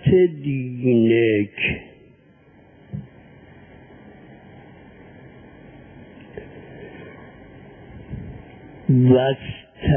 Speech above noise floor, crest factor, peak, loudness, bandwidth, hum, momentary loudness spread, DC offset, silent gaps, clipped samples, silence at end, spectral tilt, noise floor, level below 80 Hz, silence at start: 34 dB; 20 dB; -2 dBFS; -19 LUFS; 3.5 kHz; none; 28 LU; under 0.1%; none; under 0.1%; 0 s; -12 dB/octave; -52 dBFS; -44 dBFS; 0.05 s